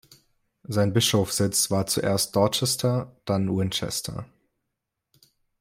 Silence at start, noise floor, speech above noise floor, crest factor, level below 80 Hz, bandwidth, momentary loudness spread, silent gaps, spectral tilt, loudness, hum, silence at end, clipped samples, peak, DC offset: 0.7 s; -82 dBFS; 58 dB; 20 dB; -58 dBFS; 16 kHz; 8 LU; none; -4 dB/octave; -24 LUFS; none; 1.35 s; under 0.1%; -6 dBFS; under 0.1%